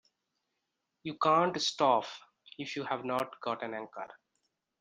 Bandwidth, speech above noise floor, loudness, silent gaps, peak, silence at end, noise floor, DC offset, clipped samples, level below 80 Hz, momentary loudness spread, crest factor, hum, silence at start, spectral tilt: 10 kHz; 52 dB; -31 LUFS; none; -12 dBFS; 0.65 s; -84 dBFS; under 0.1%; under 0.1%; -80 dBFS; 18 LU; 22 dB; none; 1.05 s; -4 dB/octave